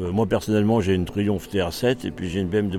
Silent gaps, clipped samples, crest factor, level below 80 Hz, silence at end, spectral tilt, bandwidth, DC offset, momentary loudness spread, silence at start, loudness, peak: none; under 0.1%; 14 dB; -44 dBFS; 0 s; -6.5 dB/octave; 16.5 kHz; under 0.1%; 6 LU; 0 s; -23 LUFS; -8 dBFS